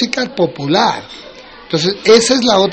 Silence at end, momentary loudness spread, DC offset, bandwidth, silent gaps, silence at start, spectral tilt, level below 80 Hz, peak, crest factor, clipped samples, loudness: 0 s; 16 LU; under 0.1%; 8.8 kHz; none; 0 s; -3.5 dB/octave; -50 dBFS; 0 dBFS; 14 dB; under 0.1%; -13 LUFS